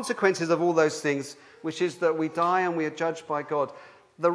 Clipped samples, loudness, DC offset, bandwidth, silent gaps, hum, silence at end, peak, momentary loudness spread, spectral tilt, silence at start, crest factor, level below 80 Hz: under 0.1%; -26 LUFS; under 0.1%; 11 kHz; none; none; 0 s; -6 dBFS; 9 LU; -5 dB/octave; 0 s; 20 dB; -80 dBFS